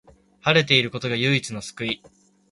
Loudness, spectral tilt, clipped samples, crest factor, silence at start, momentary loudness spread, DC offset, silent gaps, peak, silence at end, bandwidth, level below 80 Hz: -21 LUFS; -4.5 dB/octave; under 0.1%; 24 dB; 0.45 s; 13 LU; under 0.1%; none; 0 dBFS; 0.55 s; 11.5 kHz; -58 dBFS